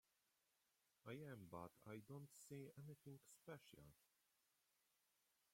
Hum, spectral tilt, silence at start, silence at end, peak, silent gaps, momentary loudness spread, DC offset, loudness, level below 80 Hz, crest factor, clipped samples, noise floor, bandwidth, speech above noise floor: none; -6 dB/octave; 1.05 s; 1.5 s; -40 dBFS; none; 7 LU; under 0.1%; -60 LUFS; -88 dBFS; 22 dB; under 0.1%; -87 dBFS; 16.5 kHz; 28 dB